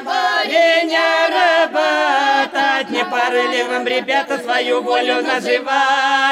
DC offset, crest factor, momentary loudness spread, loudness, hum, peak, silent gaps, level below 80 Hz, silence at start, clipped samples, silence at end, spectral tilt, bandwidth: under 0.1%; 12 dB; 5 LU; -15 LUFS; none; -4 dBFS; none; -72 dBFS; 0 s; under 0.1%; 0 s; -1.5 dB/octave; 15 kHz